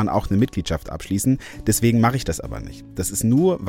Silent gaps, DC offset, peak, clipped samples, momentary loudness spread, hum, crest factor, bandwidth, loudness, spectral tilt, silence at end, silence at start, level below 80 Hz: none; under 0.1%; -4 dBFS; under 0.1%; 11 LU; none; 16 dB; 17 kHz; -21 LUFS; -5.5 dB/octave; 0 s; 0 s; -38 dBFS